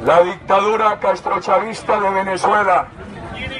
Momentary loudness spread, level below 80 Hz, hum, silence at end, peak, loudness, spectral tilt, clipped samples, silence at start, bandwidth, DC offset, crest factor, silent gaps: 13 LU; -44 dBFS; none; 0 s; -2 dBFS; -16 LUFS; -4.5 dB/octave; under 0.1%; 0 s; 11 kHz; under 0.1%; 16 dB; none